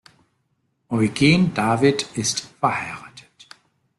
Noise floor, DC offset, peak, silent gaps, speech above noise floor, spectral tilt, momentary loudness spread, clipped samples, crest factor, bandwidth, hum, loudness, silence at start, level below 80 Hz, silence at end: -70 dBFS; under 0.1%; -4 dBFS; none; 50 dB; -4.5 dB/octave; 11 LU; under 0.1%; 18 dB; 12.5 kHz; none; -20 LUFS; 0.9 s; -54 dBFS; 0.8 s